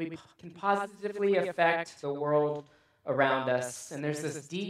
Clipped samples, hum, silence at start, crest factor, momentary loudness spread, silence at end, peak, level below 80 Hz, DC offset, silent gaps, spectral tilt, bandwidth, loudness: under 0.1%; none; 0 s; 20 dB; 13 LU; 0 s; -12 dBFS; -78 dBFS; under 0.1%; none; -5 dB/octave; 14 kHz; -30 LUFS